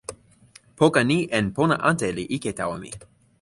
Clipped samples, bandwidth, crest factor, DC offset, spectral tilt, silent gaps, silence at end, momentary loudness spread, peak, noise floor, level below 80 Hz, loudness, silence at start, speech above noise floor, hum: under 0.1%; 11.5 kHz; 20 dB; under 0.1%; -5.5 dB/octave; none; 0.4 s; 18 LU; -4 dBFS; -53 dBFS; -54 dBFS; -22 LUFS; 0.1 s; 31 dB; none